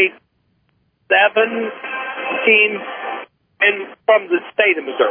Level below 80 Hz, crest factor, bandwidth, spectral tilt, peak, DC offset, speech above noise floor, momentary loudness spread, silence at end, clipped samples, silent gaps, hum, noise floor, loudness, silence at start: -76 dBFS; 18 dB; 3.6 kHz; -6 dB/octave; 0 dBFS; under 0.1%; 47 dB; 13 LU; 0 s; under 0.1%; none; none; -63 dBFS; -16 LUFS; 0 s